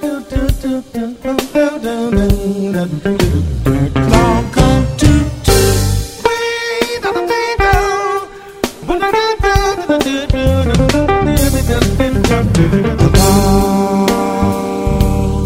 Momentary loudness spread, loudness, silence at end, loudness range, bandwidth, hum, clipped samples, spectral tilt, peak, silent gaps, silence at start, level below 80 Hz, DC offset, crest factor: 7 LU; -14 LUFS; 0 s; 4 LU; 16.5 kHz; none; under 0.1%; -5.5 dB/octave; 0 dBFS; none; 0 s; -20 dBFS; under 0.1%; 12 dB